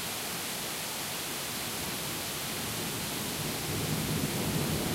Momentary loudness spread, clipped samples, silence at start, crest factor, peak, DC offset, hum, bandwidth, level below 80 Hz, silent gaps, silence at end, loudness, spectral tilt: 3 LU; under 0.1%; 0 s; 16 dB; -18 dBFS; under 0.1%; none; 16 kHz; -54 dBFS; none; 0 s; -32 LUFS; -3 dB/octave